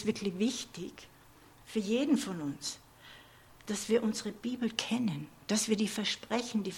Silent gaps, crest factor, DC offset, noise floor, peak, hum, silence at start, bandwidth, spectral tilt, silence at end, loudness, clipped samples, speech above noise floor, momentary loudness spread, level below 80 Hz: none; 24 dB; under 0.1%; -58 dBFS; -10 dBFS; none; 0 s; 17.5 kHz; -4 dB/octave; 0 s; -33 LUFS; under 0.1%; 25 dB; 18 LU; -68 dBFS